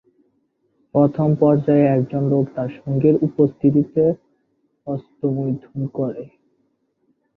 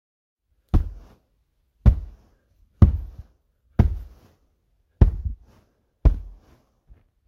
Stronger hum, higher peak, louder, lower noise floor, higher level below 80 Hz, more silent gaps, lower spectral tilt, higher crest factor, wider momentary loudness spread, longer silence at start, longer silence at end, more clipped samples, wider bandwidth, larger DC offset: neither; about the same, -2 dBFS vs 0 dBFS; first, -19 LUFS vs -23 LUFS; about the same, -67 dBFS vs -68 dBFS; second, -58 dBFS vs -26 dBFS; neither; first, -12 dB/octave vs -10.5 dB/octave; second, 18 dB vs 24 dB; second, 13 LU vs 18 LU; first, 0.95 s vs 0.75 s; first, 1.1 s vs 0.95 s; neither; about the same, 4 kHz vs 4.3 kHz; neither